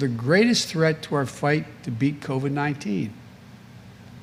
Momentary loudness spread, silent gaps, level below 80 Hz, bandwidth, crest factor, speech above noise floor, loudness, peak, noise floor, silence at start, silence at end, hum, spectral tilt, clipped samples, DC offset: 9 LU; none; -60 dBFS; 16 kHz; 18 dB; 22 dB; -24 LUFS; -6 dBFS; -45 dBFS; 0 s; 0 s; none; -5.5 dB/octave; under 0.1%; under 0.1%